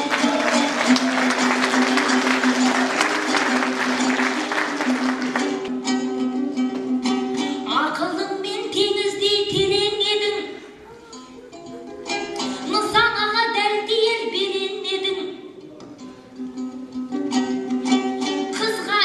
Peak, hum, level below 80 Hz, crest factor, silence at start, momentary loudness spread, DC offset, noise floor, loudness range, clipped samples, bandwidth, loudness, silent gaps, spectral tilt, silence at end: -2 dBFS; none; -60 dBFS; 20 dB; 0 s; 18 LU; under 0.1%; -41 dBFS; 7 LU; under 0.1%; 13 kHz; -21 LUFS; none; -2.5 dB/octave; 0 s